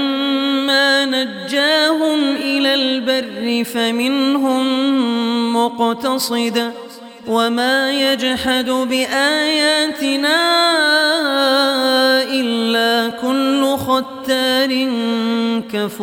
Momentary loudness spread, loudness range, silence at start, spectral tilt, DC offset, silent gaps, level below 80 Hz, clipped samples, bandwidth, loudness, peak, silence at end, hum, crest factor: 6 LU; 3 LU; 0 s; -2.5 dB/octave; under 0.1%; none; -58 dBFS; under 0.1%; 18 kHz; -16 LUFS; -2 dBFS; 0 s; none; 14 dB